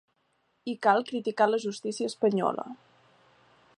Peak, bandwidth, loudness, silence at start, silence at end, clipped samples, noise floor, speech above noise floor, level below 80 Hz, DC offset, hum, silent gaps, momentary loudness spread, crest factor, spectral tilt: -8 dBFS; 11 kHz; -28 LUFS; 0.65 s; 1.05 s; under 0.1%; -73 dBFS; 45 dB; -82 dBFS; under 0.1%; none; none; 13 LU; 22 dB; -5 dB/octave